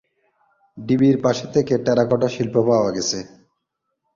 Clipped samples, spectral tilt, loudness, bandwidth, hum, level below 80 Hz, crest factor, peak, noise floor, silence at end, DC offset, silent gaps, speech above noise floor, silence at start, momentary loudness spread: under 0.1%; -5.5 dB/octave; -19 LUFS; 7.6 kHz; none; -56 dBFS; 18 dB; -4 dBFS; -77 dBFS; 0.9 s; under 0.1%; none; 58 dB; 0.75 s; 7 LU